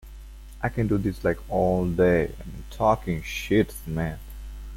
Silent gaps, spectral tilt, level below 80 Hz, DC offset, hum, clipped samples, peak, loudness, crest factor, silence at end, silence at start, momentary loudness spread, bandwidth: none; -7 dB/octave; -38 dBFS; under 0.1%; none; under 0.1%; -8 dBFS; -25 LUFS; 18 dB; 0 s; 0.05 s; 19 LU; 16.5 kHz